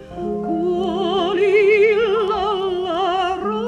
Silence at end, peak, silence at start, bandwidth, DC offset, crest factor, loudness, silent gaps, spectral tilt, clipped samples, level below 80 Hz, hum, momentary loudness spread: 0 s; -6 dBFS; 0 s; 9.2 kHz; under 0.1%; 12 dB; -18 LUFS; none; -6 dB/octave; under 0.1%; -48 dBFS; none; 8 LU